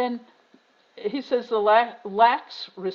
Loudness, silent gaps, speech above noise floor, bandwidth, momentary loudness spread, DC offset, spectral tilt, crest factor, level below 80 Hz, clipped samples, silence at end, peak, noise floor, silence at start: -23 LUFS; none; 36 dB; 6.8 kHz; 14 LU; under 0.1%; -1.5 dB/octave; 20 dB; -76 dBFS; under 0.1%; 0 s; -6 dBFS; -59 dBFS; 0 s